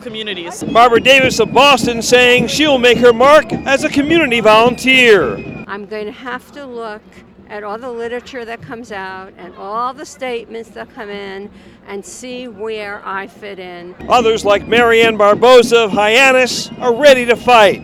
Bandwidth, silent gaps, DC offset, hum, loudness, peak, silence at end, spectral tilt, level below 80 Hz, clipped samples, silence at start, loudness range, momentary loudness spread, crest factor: 17.5 kHz; none; under 0.1%; none; -10 LUFS; 0 dBFS; 0 s; -3.5 dB/octave; -44 dBFS; under 0.1%; 0 s; 17 LU; 21 LU; 12 dB